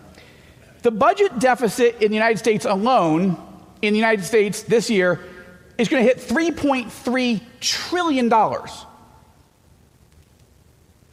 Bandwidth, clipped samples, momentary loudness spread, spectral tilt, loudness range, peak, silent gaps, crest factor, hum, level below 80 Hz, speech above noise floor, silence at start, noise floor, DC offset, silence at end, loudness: 15.5 kHz; under 0.1%; 7 LU; -4.5 dB/octave; 5 LU; -6 dBFS; none; 14 dB; none; -56 dBFS; 35 dB; 0.85 s; -54 dBFS; under 0.1%; 2.25 s; -19 LUFS